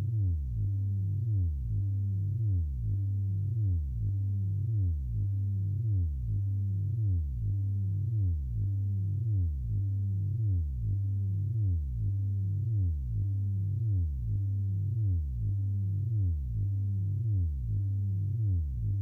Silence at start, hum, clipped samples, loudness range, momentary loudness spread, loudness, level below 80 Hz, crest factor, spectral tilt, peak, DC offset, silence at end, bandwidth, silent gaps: 0 s; none; under 0.1%; 0 LU; 2 LU; -32 LUFS; -40 dBFS; 8 dB; -12 dB/octave; -22 dBFS; under 0.1%; 0 s; 0.6 kHz; none